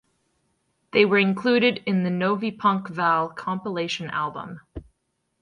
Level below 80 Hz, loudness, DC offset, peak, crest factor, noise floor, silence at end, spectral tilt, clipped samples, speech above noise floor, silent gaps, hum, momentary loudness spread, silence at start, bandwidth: -56 dBFS; -23 LUFS; under 0.1%; -4 dBFS; 20 dB; -75 dBFS; 0.6 s; -6 dB/octave; under 0.1%; 52 dB; none; none; 17 LU; 0.95 s; 10 kHz